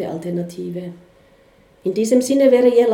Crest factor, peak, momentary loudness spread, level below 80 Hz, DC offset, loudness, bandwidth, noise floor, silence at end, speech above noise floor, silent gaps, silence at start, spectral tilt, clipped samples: 16 dB; -2 dBFS; 16 LU; -62 dBFS; under 0.1%; -17 LUFS; 16.5 kHz; -52 dBFS; 0 s; 35 dB; none; 0 s; -6 dB/octave; under 0.1%